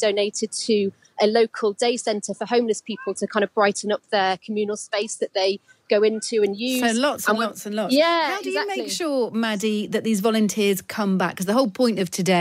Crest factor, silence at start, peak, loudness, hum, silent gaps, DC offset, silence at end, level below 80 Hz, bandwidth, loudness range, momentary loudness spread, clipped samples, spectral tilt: 16 dB; 0 s; -6 dBFS; -22 LUFS; none; none; under 0.1%; 0 s; -72 dBFS; 16 kHz; 2 LU; 6 LU; under 0.1%; -4 dB/octave